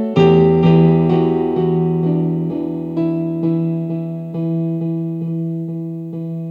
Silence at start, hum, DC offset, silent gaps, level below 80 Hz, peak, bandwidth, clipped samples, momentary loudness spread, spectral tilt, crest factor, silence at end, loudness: 0 s; none; under 0.1%; none; -46 dBFS; -2 dBFS; 4.8 kHz; under 0.1%; 13 LU; -10.5 dB/octave; 16 dB; 0 s; -17 LUFS